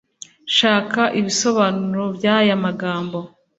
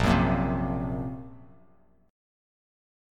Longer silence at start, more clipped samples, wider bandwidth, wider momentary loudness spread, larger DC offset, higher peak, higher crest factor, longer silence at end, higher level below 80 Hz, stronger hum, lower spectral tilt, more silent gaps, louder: first, 0.45 s vs 0 s; neither; second, 8 kHz vs 14 kHz; second, 10 LU vs 18 LU; neither; first, -2 dBFS vs -8 dBFS; about the same, 18 dB vs 20 dB; second, 0.3 s vs 1.65 s; second, -62 dBFS vs -40 dBFS; neither; second, -4 dB/octave vs -7.5 dB/octave; neither; first, -18 LUFS vs -28 LUFS